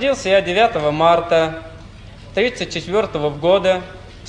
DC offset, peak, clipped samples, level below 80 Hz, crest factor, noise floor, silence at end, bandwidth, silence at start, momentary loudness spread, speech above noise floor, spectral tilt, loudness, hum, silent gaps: under 0.1%; -2 dBFS; under 0.1%; -42 dBFS; 16 dB; -38 dBFS; 0 s; 10.5 kHz; 0 s; 11 LU; 21 dB; -5 dB/octave; -17 LUFS; none; none